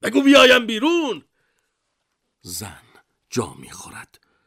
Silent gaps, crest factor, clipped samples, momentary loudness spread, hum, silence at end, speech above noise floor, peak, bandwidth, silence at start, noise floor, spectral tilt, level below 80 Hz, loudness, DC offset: none; 18 dB; under 0.1%; 26 LU; none; 0.45 s; 56 dB; -4 dBFS; 16 kHz; 0.05 s; -75 dBFS; -3 dB/octave; -60 dBFS; -16 LUFS; under 0.1%